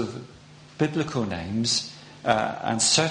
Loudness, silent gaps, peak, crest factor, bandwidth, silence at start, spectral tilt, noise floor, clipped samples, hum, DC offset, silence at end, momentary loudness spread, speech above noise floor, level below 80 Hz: -25 LUFS; none; -4 dBFS; 22 dB; 10.5 kHz; 0 s; -3 dB/octave; -48 dBFS; under 0.1%; none; under 0.1%; 0 s; 12 LU; 24 dB; -56 dBFS